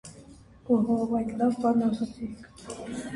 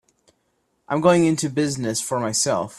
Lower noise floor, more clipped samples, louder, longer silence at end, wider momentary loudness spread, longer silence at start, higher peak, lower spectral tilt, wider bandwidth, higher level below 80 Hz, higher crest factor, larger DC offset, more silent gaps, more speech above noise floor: second, -51 dBFS vs -69 dBFS; neither; second, -27 LUFS vs -21 LUFS; about the same, 0 s vs 0 s; first, 19 LU vs 7 LU; second, 0.05 s vs 0.9 s; second, -12 dBFS vs -2 dBFS; first, -7 dB/octave vs -4.5 dB/octave; second, 11.5 kHz vs 13.5 kHz; about the same, -56 dBFS vs -60 dBFS; about the same, 16 dB vs 20 dB; neither; neither; second, 23 dB vs 49 dB